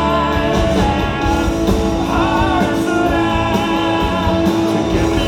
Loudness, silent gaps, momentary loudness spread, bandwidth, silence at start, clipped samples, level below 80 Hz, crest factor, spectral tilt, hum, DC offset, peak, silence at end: -16 LUFS; none; 2 LU; 16.5 kHz; 0 s; under 0.1%; -24 dBFS; 14 dB; -6 dB/octave; none; under 0.1%; 0 dBFS; 0 s